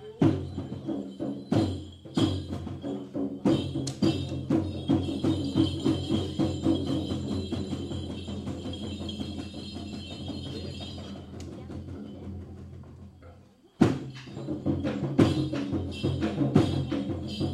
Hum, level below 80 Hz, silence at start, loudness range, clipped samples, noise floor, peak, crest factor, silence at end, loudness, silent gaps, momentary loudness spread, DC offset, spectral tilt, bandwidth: none; -52 dBFS; 0 s; 11 LU; under 0.1%; -54 dBFS; -6 dBFS; 24 dB; 0 s; -30 LUFS; none; 15 LU; under 0.1%; -7 dB/octave; 11.5 kHz